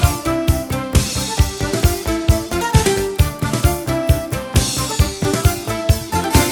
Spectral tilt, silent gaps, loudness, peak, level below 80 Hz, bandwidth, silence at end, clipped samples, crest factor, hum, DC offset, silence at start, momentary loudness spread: -4.5 dB/octave; none; -18 LUFS; 0 dBFS; -22 dBFS; over 20 kHz; 0 s; under 0.1%; 16 dB; none; under 0.1%; 0 s; 4 LU